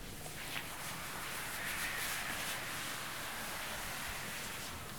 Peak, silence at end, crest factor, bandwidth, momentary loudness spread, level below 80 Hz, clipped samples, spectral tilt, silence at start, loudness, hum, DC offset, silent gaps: -24 dBFS; 0 s; 18 dB; over 20 kHz; 5 LU; -58 dBFS; under 0.1%; -1.5 dB/octave; 0 s; -40 LUFS; none; 0.2%; none